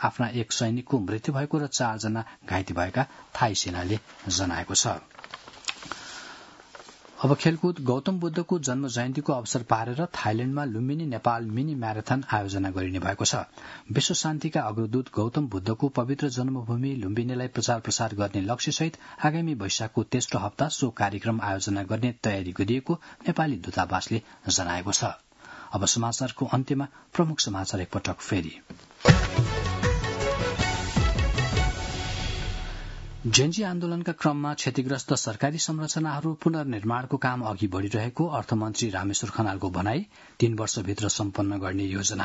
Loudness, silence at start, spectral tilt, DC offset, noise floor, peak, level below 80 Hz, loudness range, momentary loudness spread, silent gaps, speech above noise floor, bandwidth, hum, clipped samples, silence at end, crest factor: -27 LUFS; 0 s; -4.5 dB/octave; under 0.1%; -48 dBFS; -2 dBFS; -42 dBFS; 2 LU; 7 LU; none; 21 dB; 8.2 kHz; none; under 0.1%; 0 s; 24 dB